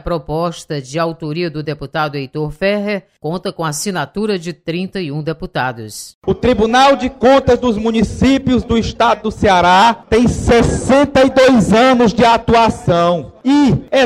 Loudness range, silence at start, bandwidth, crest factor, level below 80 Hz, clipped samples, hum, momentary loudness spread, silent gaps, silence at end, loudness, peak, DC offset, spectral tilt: 9 LU; 0.05 s; 15 kHz; 12 dB; -32 dBFS; under 0.1%; none; 12 LU; 6.14-6.21 s; 0 s; -14 LUFS; -2 dBFS; under 0.1%; -5.5 dB/octave